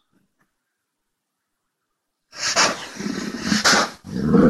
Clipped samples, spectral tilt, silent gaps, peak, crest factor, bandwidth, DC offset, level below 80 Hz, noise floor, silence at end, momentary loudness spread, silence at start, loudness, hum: under 0.1%; -3.5 dB/octave; none; -4 dBFS; 20 dB; 13 kHz; under 0.1%; -50 dBFS; -78 dBFS; 0 s; 12 LU; 2.35 s; -20 LUFS; none